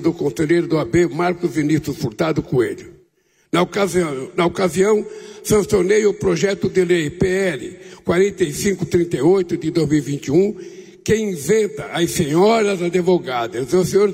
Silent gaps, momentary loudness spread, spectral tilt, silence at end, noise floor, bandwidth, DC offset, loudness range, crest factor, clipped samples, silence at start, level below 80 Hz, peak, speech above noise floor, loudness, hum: none; 7 LU; -5.5 dB/octave; 0 s; -60 dBFS; 16 kHz; under 0.1%; 2 LU; 14 dB; under 0.1%; 0 s; -46 dBFS; -4 dBFS; 42 dB; -18 LUFS; none